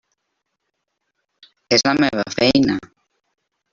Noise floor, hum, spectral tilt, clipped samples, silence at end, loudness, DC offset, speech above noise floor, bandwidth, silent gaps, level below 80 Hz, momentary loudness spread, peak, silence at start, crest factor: -76 dBFS; none; -4 dB/octave; under 0.1%; 0.9 s; -17 LUFS; under 0.1%; 59 dB; 7.4 kHz; none; -52 dBFS; 5 LU; -2 dBFS; 1.7 s; 20 dB